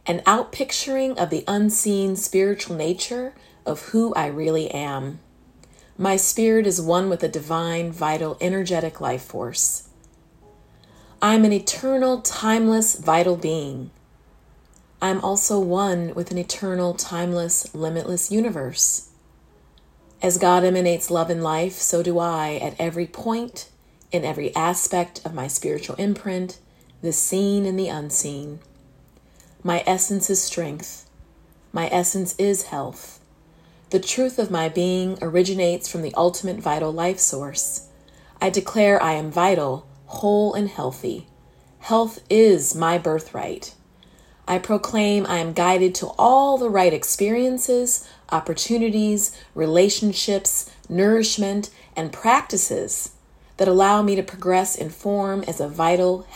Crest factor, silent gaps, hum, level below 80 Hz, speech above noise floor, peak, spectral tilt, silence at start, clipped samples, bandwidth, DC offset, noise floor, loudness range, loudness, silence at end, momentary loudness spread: 20 dB; none; none; -56 dBFS; 33 dB; -2 dBFS; -4 dB/octave; 0.05 s; under 0.1%; 16.5 kHz; under 0.1%; -54 dBFS; 5 LU; -21 LUFS; 0 s; 11 LU